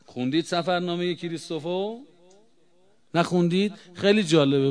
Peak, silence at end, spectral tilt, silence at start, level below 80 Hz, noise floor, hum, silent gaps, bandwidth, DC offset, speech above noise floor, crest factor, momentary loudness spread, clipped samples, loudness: -4 dBFS; 0 s; -6 dB/octave; 0.1 s; -72 dBFS; -64 dBFS; none; none; 10.5 kHz; 0.1%; 40 dB; 20 dB; 12 LU; under 0.1%; -25 LUFS